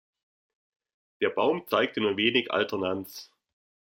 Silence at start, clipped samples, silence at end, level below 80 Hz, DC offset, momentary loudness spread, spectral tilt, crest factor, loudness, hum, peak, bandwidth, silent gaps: 1.2 s; under 0.1%; 0.75 s; -74 dBFS; under 0.1%; 11 LU; -4.5 dB/octave; 20 dB; -27 LUFS; none; -8 dBFS; 16.5 kHz; none